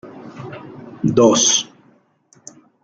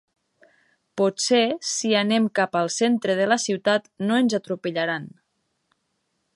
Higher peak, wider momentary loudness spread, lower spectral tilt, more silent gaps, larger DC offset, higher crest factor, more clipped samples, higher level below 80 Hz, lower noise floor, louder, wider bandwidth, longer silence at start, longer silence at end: first, -2 dBFS vs -6 dBFS; first, 24 LU vs 7 LU; about the same, -3.5 dB/octave vs -3.5 dB/octave; neither; neither; about the same, 18 dB vs 18 dB; neither; first, -58 dBFS vs -74 dBFS; second, -56 dBFS vs -74 dBFS; first, -14 LUFS vs -22 LUFS; about the same, 10.5 kHz vs 11.5 kHz; second, 0.05 s vs 0.95 s; about the same, 1.2 s vs 1.25 s